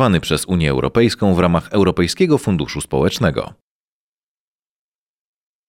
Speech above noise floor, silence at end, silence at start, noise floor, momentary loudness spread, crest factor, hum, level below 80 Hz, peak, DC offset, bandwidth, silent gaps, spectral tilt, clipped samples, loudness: over 74 dB; 2.2 s; 0 s; under -90 dBFS; 5 LU; 18 dB; none; -38 dBFS; 0 dBFS; under 0.1%; 16 kHz; none; -6 dB/octave; under 0.1%; -17 LUFS